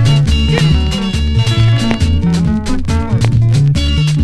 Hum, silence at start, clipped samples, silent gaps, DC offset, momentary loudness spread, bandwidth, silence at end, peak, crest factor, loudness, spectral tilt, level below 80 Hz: none; 0 s; under 0.1%; none; under 0.1%; 5 LU; 12 kHz; 0 s; 0 dBFS; 10 dB; -13 LUFS; -6.5 dB/octave; -18 dBFS